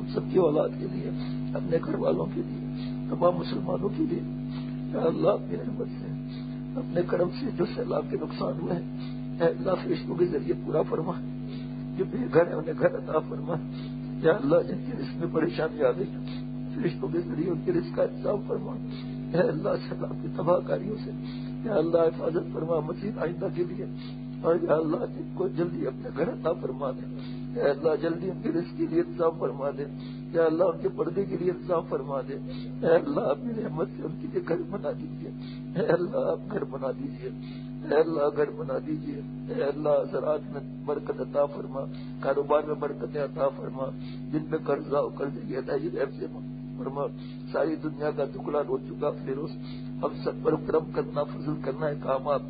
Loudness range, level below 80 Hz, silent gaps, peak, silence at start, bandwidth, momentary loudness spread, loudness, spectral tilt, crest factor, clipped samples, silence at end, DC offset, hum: 3 LU; -54 dBFS; none; -8 dBFS; 0 s; 5 kHz; 10 LU; -29 LUFS; -11.5 dB/octave; 20 dB; under 0.1%; 0 s; under 0.1%; none